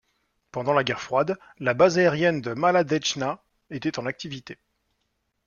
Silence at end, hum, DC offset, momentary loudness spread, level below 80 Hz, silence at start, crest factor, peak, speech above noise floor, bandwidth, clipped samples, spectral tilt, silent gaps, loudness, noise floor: 0.9 s; none; under 0.1%; 17 LU; -64 dBFS; 0.55 s; 20 dB; -6 dBFS; 51 dB; 7.2 kHz; under 0.1%; -5 dB/octave; none; -24 LUFS; -75 dBFS